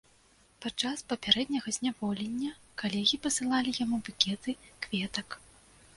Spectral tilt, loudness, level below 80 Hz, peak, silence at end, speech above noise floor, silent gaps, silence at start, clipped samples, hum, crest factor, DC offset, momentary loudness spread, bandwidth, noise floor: -2.5 dB/octave; -31 LUFS; -64 dBFS; -8 dBFS; 0.6 s; 32 dB; none; 0.6 s; under 0.1%; none; 26 dB; under 0.1%; 12 LU; 11.5 kHz; -64 dBFS